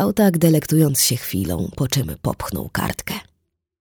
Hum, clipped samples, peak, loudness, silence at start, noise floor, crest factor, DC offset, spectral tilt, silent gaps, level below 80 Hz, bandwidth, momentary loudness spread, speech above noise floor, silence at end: none; under 0.1%; -2 dBFS; -20 LUFS; 0 s; -70 dBFS; 18 dB; under 0.1%; -5 dB/octave; none; -42 dBFS; over 20 kHz; 11 LU; 50 dB; 0.6 s